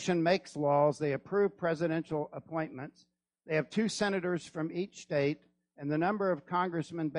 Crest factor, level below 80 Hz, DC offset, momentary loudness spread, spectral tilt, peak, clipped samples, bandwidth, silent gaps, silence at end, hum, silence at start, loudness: 18 dB; -74 dBFS; under 0.1%; 9 LU; -6 dB/octave; -14 dBFS; under 0.1%; 11 kHz; none; 0 s; none; 0 s; -32 LUFS